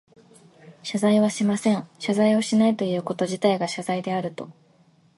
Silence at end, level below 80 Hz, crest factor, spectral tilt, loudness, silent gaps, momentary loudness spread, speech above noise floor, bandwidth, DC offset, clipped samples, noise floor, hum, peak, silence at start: 0.65 s; -68 dBFS; 18 dB; -5.5 dB/octave; -23 LUFS; none; 11 LU; 36 dB; 11.5 kHz; under 0.1%; under 0.1%; -59 dBFS; none; -6 dBFS; 0.65 s